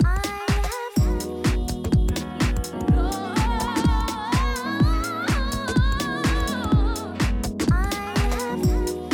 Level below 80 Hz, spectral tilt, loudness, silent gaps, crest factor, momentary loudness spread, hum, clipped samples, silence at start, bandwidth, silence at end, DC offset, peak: -26 dBFS; -5.5 dB/octave; -24 LUFS; none; 14 dB; 3 LU; none; under 0.1%; 0 s; 19.5 kHz; 0 s; under 0.1%; -8 dBFS